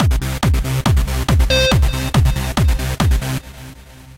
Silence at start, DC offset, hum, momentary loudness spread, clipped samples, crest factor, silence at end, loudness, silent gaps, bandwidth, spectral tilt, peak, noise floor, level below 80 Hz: 0 s; under 0.1%; none; 12 LU; under 0.1%; 14 dB; 0.15 s; -17 LUFS; none; 16.5 kHz; -5 dB/octave; -2 dBFS; -38 dBFS; -18 dBFS